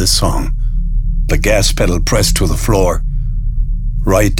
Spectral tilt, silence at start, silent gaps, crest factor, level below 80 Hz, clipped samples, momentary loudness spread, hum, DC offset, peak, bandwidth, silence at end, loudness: -4 dB/octave; 0 s; none; 12 dB; -14 dBFS; under 0.1%; 8 LU; none; under 0.1%; 0 dBFS; 17 kHz; 0 s; -15 LUFS